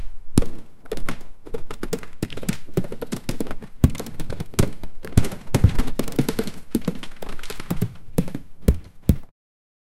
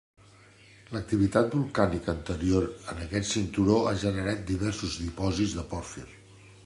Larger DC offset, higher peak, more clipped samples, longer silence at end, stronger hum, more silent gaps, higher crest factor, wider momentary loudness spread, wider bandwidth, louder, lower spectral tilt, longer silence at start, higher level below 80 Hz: neither; first, 0 dBFS vs -8 dBFS; neither; first, 0.75 s vs 0.1 s; neither; neither; about the same, 22 dB vs 22 dB; about the same, 14 LU vs 13 LU; first, 16.5 kHz vs 11.5 kHz; first, -26 LUFS vs -29 LUFS; about the same, -6.5 dB/octave vs -5.5 dB/octave; second, 0 s vs 0.9 s; first, -30 dBFS vs -44 dBFS